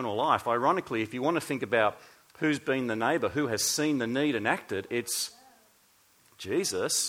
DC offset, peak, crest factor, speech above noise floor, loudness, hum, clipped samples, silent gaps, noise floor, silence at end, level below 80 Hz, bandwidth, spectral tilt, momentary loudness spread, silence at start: under 0.1%; -10 dBFS; 20 dB; 35 dB; -29 LUFS; none; under 0.1%; none; -64 dBFS; 0 s; -68 dBFS; 17 kHz; -3 dB/octave; 6 LU; 0 s